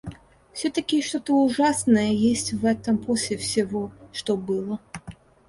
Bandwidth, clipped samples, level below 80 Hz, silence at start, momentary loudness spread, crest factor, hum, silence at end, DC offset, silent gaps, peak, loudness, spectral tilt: 11.5 kHz; under 0.1%; -54 dBFS; 0.05 s; 14 LU; 16 dB; none; 0.35 s; under 0.1%; none; -8 dBFS; -24 LUFS; -4.5 dB/octave